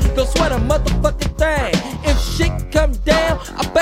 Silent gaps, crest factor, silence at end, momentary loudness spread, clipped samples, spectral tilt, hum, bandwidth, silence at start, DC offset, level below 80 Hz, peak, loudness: none; 16 dB; 0 s; 4 LU; under 0.1%; -5 dB/octave; none; 16 kHz; 0 s; under 0.1%; -20 dBFS; 0 dBFS; -18 LUFS